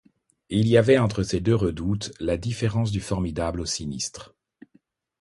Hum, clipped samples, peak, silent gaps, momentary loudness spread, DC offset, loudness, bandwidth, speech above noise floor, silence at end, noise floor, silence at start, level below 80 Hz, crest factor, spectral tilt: none; under 0.1%; -4 dBFS; none; 10 LU; under 0.1%; -24 LUFS; 11.5 kHz; 40 dB; 0.95 s; -63 dBFS; 0.5 s; -42 dBFS; 20 dB; -6 dB/octave